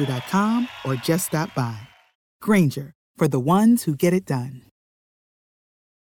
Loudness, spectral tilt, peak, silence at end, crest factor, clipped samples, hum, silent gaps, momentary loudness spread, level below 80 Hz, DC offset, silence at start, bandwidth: -22 LUFS; -6 dB/octave; -8 dBFS; 1.45 s; 16 dB; under 0.1%; none; 2.15-2.40 s, 2.95-3.14 s; 13 LU; -62 dBFS; under 0.1%; 0 s; 19.5 kHz